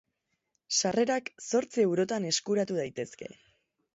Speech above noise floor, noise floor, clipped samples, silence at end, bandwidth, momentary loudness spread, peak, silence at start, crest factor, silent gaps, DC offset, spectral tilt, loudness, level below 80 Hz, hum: 52 dB; -81 dBFS; under 0.1%; 0.6 s; 8 kHz; 12 LU; -14 dBFS; 0.7 s; 16 dB; none; under 0.1%; -3.5 dB/octave; -29 LUFS; -74 dBFS; none